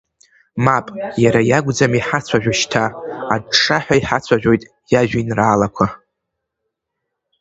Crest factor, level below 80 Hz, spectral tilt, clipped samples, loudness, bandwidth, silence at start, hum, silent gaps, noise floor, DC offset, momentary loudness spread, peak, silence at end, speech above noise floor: 18 dB; -46 dBFS; -5 dB/octave; under 0.1%; -16 LUFS; 8.2 kHz; 0.55 s; none; none; -78 dBFS; under 0.1%; 7 LU; 0 dBFS; 1.45 s; 62 dB